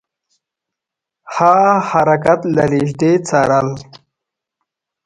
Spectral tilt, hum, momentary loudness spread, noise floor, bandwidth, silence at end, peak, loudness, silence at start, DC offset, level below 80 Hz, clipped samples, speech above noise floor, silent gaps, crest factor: -6.5 dB/octave; none; 7 LU; -84 dBFS; 11 kHz; 1.25 s; 0 dBFS; -14 LUFS; 1.25 s; under 0.1%; -52 dBFS; under 0.1%; 70 dB; none; 16 dB